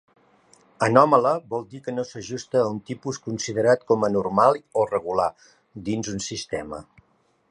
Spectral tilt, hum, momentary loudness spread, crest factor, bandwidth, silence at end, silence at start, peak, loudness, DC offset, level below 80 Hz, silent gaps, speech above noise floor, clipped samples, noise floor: -5 dB/octave; none; 14 LU; 22 dB; 10.5 kHz; 0.7 s; 0.8 s; -2 dBFS; -23 LUFS; under 0.1%; -58 dBFS; none; 42 dB; under 0.1%; -65 dBFS